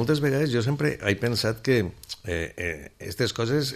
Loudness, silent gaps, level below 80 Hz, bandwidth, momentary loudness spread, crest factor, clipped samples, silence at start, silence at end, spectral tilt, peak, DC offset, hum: -26 LUFS; none; -50 dBFS; 14 kHz; 9 LU; 18 dB; under 0.1%; 0 s; 0 s; -5.5 dB/octave; -8 dBFS; under 0.1%; none